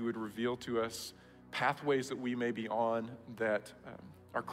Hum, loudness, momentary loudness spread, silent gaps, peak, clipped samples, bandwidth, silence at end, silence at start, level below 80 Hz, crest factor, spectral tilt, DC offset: none; -36 LUFS; 13 LU; none; -18 dBFS; under 0.1%; 16 kHz; 0 s; 0 s; -72 dBFS; 20 dB; -5 dB/octave; under 0.1%